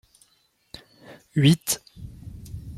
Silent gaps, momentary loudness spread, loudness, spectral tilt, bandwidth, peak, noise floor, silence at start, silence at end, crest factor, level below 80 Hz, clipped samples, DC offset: none; 26 LU; -22 LUFS; -5 dB/octave; 16 kHz; -6 dBFS; -66 dBFS; 1.35 s; 0 s; 22 dB; -50 dBFS; under 0.1%; under 0.1%